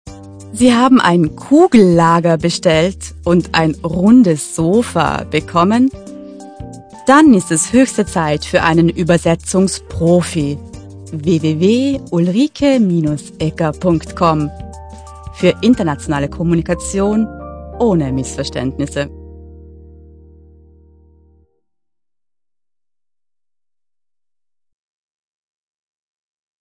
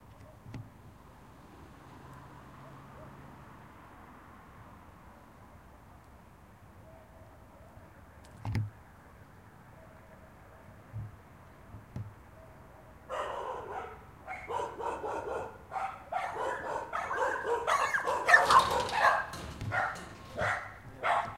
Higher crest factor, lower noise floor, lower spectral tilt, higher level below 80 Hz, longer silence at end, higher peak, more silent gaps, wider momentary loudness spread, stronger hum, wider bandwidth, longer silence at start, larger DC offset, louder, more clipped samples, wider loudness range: second, 14 dB vs 28 dB; first, under -90 dBFS vs -56 dBFS; first, -5.5 dB/octave vs -3.5 dB/octave; first, -38 dBFS vs -58 dBFS; first, 6.9 s vs 0 s; first, 0 dBFS vs -8 dBFS; neither; second, 21 LU vs 26 LU; neither; second, 10.5 kHz vs 16 kHz; about the same, 0.05 s vs 0 s; neither; first, -14 LUFS vs -31 LUFS; neither; second, 8 LU vs 25 LU